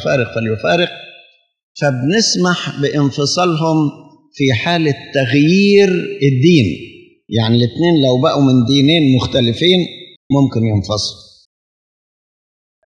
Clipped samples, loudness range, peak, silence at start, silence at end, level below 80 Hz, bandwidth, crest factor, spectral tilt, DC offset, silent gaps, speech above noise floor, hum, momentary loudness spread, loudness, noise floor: under 0.1%; 4 LU; 0 dBFS; 0 s; 1.85 s; -52 dBFS; 10 kHz; 14 dB; -5.5 dB/octave; under 0.1%; 1.63-1.75 s, 10.16-10.30 s; 34 dB; none; 8 LU; -14 LUFS; -47 dBFS